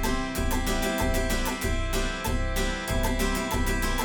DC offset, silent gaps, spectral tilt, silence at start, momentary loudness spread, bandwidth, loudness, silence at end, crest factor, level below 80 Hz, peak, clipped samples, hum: under 0.1%; none; -4 dB/octave; 0 s; 2 LU; over 20 kHz; -28 LUFS; 0 s; 14 dB; -30 dBFS; -12 dBFS; under 0.1%; none